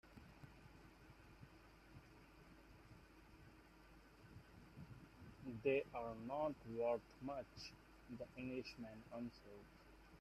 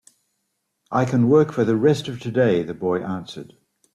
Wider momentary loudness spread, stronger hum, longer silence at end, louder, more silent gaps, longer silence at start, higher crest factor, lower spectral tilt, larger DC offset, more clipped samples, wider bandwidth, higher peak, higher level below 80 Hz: first, 22 LU vs 13 LU; neither; second, 0 s vs 0.5 s; second, -48 LUFS vs -20 LUFS; neither; second, 0.05 s vs 0.9 s; first, 24 dB vs 16 dB; about the same, -6.5 dB/octave vs -7.5 dB/octave; neither; neither; first, 13.5 kHz vs 11 kHz; second, -28 dBFS vs -6 dBFS; second, -70 dBFS vs -60 dBFS